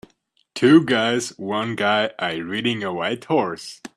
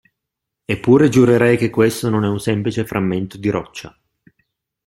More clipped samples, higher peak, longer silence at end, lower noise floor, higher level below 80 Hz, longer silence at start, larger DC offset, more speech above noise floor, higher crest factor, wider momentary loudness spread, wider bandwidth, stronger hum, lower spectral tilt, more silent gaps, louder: neither; about the same, -2 dBFS vs -2 dBFS; second, 0.1 s vs 1 s; second, -64 dBFS vs -81 dBFS; second, -64 dBFS vs -50 dBFS; second, 0.55 s vs 0.7 s; neither; second, 44 dB vs 65 dB; about the same, 18 dB vs 16 dB; about the same, 11 LU vs 13 LU; second, 12.5 kHz vs 16.5 kHz; neither; second, -5 dB/octave vs -6.5 dB/octave; neither; second, -20 LUFS vs -16 LUFS